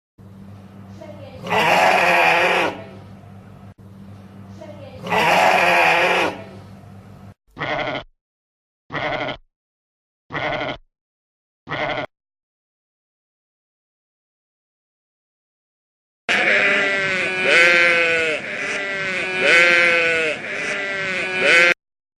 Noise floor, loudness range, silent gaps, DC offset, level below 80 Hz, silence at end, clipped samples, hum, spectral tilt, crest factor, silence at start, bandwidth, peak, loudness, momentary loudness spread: -41 dBFS; 14 LU; 8.21-8.90 s, 9.56-10.30 s, 11.01-11.66 s, 12.43-16.28 s; under 0.1%; -56 dBFS; 0.45 s; under 0.1%; none; -3 dB/octave; 20 dB; 0.2 s; 14 kHz; 0 dBFS; -16 LUFS; 20 LU